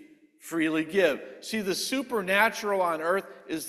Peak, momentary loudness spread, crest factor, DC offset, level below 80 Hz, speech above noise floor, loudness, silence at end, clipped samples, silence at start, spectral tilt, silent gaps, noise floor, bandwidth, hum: -6 dBFS; 11 LU; 22 dB; under 0.1%; -70 dBFS; 23 dB; -27 LUFS; 0 s; under 0.1%; 0 s; -3.5 dB/octave; none; -50 dBFS; 14.5 kHz; none